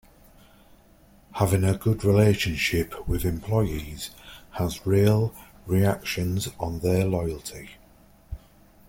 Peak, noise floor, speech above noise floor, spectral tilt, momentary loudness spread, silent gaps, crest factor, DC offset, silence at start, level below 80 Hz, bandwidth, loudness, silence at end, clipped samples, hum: -6 dBFS; -55 dBFS; 31 dB; -6 dB/octave; 22 LU; none; 18 dB; under 0.1%; 1.35 s; -42 dBFS; 17 kHz; -25 LUFS; 0.5 s; under 0.1%; none